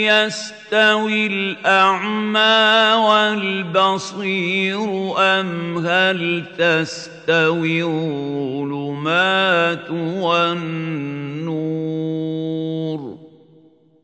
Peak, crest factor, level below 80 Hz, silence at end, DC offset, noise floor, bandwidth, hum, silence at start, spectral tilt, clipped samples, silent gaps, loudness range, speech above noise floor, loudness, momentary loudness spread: -2 dBFS; 16 dB; -68 dBFS; 0.75 s; under 0.1%; -51 dBFS; 9.2 kHz; none; 0 s; -4.5 dB/octave; under 0.1%; none; 7 LU; 33 dB; -18 LUFS; 11 LU